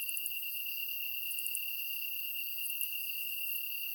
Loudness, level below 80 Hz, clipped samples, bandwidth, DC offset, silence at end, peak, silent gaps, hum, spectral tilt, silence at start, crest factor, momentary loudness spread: -34 LUFS; under -90 dBFS; under 0.1%; over 20 kHz; under 0.1%; 0 s; -16 dBFS; none; none; 5 dB/octave; 0 s; 22 dB; 1 LU